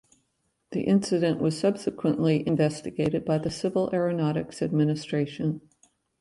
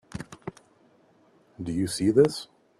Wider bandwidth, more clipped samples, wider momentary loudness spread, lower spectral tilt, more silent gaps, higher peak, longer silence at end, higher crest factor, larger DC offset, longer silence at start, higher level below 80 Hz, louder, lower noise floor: second, 11.5 kHz vs 13 kHz; neither; second, 6 LU vs 20 LU; about the same, -7 dB/octave vs -6 dB/octave; neither; second, -10 dBFS vs -6 dBFS; first, 0.6 s vs 0.35 s; second, 16 dB vs 22 dB; neither; first, 0.7 s vs 0.15 s; about the same, -60 dBFS vs -58 dBFS; about the same, -26 LUFS vs -25 LUFS; first, -74 dBFS vs -61 dBFS